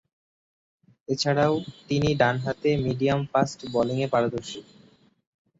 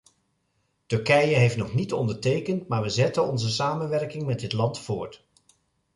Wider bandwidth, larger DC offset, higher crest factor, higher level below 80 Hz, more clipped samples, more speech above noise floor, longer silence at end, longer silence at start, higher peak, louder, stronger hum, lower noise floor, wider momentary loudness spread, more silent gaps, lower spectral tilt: second, 8 kHz vs 11.5 kHz; neither; about the same, 18 dB vs 18 dB; about the same, -54 dBFS vs -58 dBFS; neither; second, 33 dB vs 48 dB; first, 0.95 s vs 0.8 s; first, 1.1 s vs 0.9 s; about the same, -8 dBFS vs -8 dBFS; about the same, -25 LUFS vs -25 LUFS; neither; second, -58 dBFS vs -72 dBFS; about the same, 9 LU vs 9 LU; neither; about the same, -6 dB/octave vs -5.5 dB/octave